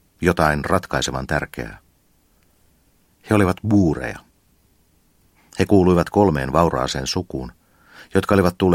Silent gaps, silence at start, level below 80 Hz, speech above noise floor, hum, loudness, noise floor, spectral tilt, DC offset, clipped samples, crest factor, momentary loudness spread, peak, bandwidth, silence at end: none; 0.2 s; -40 dBFS; 41 dB; none; -19 LUFS; -60 dBFS; -6 dB/octave; under 0.1%; under 0.1%; 20 dB; 15 LU; 0 dBFS; 16.5 kHz; 0 s